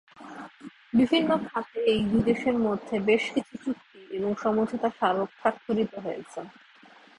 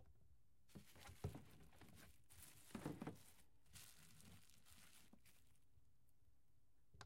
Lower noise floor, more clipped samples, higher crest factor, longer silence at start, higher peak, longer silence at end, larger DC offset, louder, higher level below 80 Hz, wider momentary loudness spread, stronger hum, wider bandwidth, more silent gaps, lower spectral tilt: second, -54 dBFS vs -81 dBFS; neither; second, 18 dB vs 26 dB; first, 0.2 s vs 0 s; first, -8 dBFS vs -36 dBFS; first, 0.7 s vs 0 s; neither; first, -27 LUFS vs -61 LUFS; first, -60 dBFS vs -76 dBFS; first, 17 LU vs 13 LU; neither; second, 10.5 kHz vs 16 kHz; neither; first, -6.5 dB/octave vs -5 dB/octave